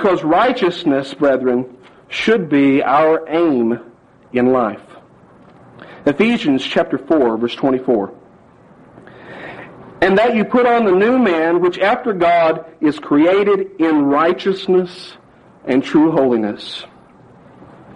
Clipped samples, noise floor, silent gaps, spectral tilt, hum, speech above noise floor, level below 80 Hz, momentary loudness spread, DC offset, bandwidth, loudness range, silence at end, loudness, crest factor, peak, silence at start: under 0.1%; -46 dBFS; none; -6.5 dB/octave; none; 31 dB; -54 dBFS; 14 LU; under 0.1%; 9.8 kHz; 5 LU; 0.05 s; -15 LUFS; 14 dB; -2 dBFS; 0 s